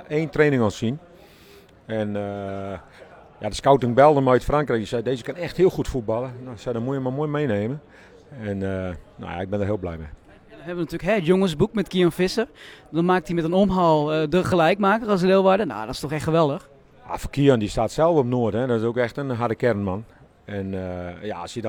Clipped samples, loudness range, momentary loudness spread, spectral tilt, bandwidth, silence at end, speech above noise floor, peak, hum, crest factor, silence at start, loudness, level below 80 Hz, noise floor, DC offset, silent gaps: under 0.1%; 8 LU; 15 LU; -7 dB/octave; 18 kHz; 0 s; 28 dB; -2 dBFS; none; 20 dB; 0 s; -22 LUFS; -44 dBFS; -50 dBFS; under 0.1%; none